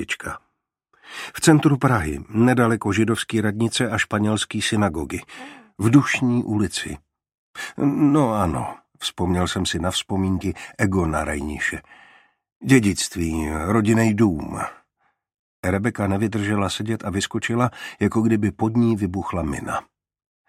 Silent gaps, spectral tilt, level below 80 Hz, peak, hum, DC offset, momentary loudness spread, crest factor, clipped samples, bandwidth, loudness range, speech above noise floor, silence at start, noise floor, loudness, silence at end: 7.38-7.54 s, 12.56-12.60 s, 15.39-15.63 s; -5.5 dB/octave; -44 dBFS; -2 dBFS; none; under 0.1%; 14 LU; 20 dB; under 0.1%; 15.5 kHz; 4 LU; 49 dB; 0 s; -69 dBFS; -21 LUFS; 0.7 s